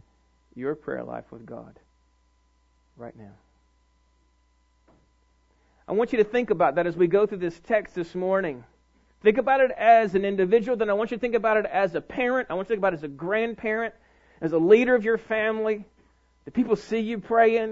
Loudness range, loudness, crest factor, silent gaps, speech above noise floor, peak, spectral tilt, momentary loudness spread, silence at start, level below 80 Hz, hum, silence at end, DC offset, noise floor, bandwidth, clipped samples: 14 LU; -24 LUFS; 20 dB; none; 41 dB; -4 dBFS; -7 dB/octave; 15 LU; 0.55 s; -60 dBFS; none; 0 s; under 0.1%; -65 dBFS; 7.6 kHz; under 0.1%